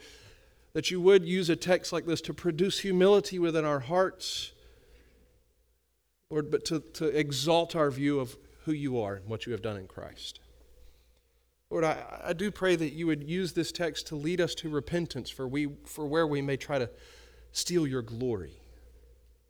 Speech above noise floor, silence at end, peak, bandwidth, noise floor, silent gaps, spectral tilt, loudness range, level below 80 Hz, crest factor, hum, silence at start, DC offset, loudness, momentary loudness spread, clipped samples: 45 dB; 0.6 s; -12 dBFS; 19.5 kHz; -75 dBFS; none; -5 dB/octave; 9 LU; -58 dBFS; 20 dB; none; 0 s; under 0.1%; -30 LUFS; 12 LU; under 0.1%